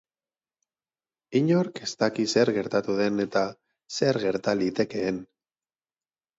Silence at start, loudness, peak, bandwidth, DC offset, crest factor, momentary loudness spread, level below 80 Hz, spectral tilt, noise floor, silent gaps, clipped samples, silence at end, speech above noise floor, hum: 1.3 s; -26 LUFS; -8 dBFS; 8 kHz; under 0.1%; 20 dB; 8 LU; -66 dBFS; -5.5 dB/octave; under -90 dBFS; none; under 0.1%; 1.15 s; over 65 dB; none